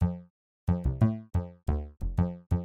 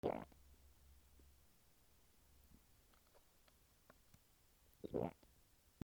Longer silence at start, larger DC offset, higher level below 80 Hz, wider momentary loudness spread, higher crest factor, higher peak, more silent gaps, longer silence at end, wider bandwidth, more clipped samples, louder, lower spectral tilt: about the same, 0 s vs 0.05 s; neither; first, -36 dBFS vs -72 dBFS; second, 7 LU vs 23 LU; second, 18 dB vs 28 dB; first, -12 dBFS vs -26 dBFS; first, 0.30-0.67 s vs none; second, 0 s vs 0.7 s; second, 4.3 kHz vs over 20 kHz; neither; first, -31 LUFS vs -49 LUFS; first, -10.5 dB/octave vs -7 dB/octave